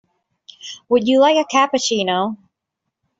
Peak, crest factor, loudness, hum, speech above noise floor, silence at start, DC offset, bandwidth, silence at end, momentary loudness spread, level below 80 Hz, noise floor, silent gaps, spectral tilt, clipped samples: -2 dBFS; 16 dB; -16 LUFS; none; 63 dB; 0.65 s; under 0.1%; 8 kHz; 0.85 s; 21 LU; -64 dBFS; -79 dBFS; none; -3.5 dB/octave; under 0.1%